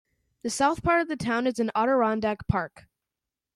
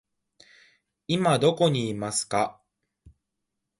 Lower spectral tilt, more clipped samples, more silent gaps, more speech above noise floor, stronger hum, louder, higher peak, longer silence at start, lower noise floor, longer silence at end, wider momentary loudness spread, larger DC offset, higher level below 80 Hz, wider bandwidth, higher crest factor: about the same, -5.5 dB/octave vs -4.5 dB/octave; neither; neither; first, 63 dB vs 58 dB; neither; about the same, -26 LUFS vs -25 LUFS; about the same, -10 dBFS vs -8 dBFS; second, 0.45 s vs 1.1 s; first, -88 dBFS vs -82 dBFS; second, 0.9 s vs 1.3 s; about the same, 8 LU vs 9 LU; neither; first, -50 dBFS vs -62 dBFS; first, 13.5 kHz vs 11.5 kHz; about the same, 18 dB vs 20 dB